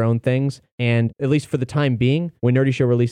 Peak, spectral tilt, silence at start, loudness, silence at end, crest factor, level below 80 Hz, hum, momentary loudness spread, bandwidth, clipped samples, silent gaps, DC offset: -6 dBFS; -8 dB/octave; 0 s; -20 LUFS; 0 s; 12 dB; -54 dBFS; none; 4 LU; 10 kHz; under 0.1%; 0.72-0.78 s; under 0.1%